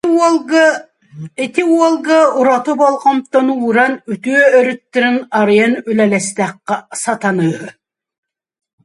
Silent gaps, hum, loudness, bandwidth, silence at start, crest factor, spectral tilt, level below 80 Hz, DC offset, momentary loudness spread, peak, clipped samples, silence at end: none; none; -13 LUFS; 11.5 kHz; 0.05 s; 14 dB; -5 dB/octave; -64 dBFS; under 0.1%; 10 LU; 0 dBFS; under 0.1%; 1.15 s